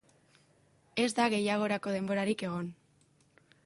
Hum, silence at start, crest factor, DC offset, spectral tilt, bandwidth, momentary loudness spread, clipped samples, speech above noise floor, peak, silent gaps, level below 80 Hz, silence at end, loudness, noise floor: none; 0.95 s; 18 dB; under 0.1%; -5 dB/octave; 11.5 kHz; 11 LU; under 0.1%; 37 dB; -16 dBFS; none; -74 dBFS; 0.9 s; -32 LUFS; -68 dBFS